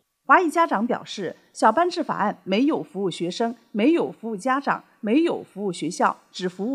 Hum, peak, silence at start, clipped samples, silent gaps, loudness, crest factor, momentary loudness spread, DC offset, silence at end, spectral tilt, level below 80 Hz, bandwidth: none; -2 dBFS; 0.3 s; under 0.1%; none; -23 LUFS; 20 dB; 10 LU; under 0.1%; 0 s; -5 dB/octave; -82 dBFS; 12.5 kHz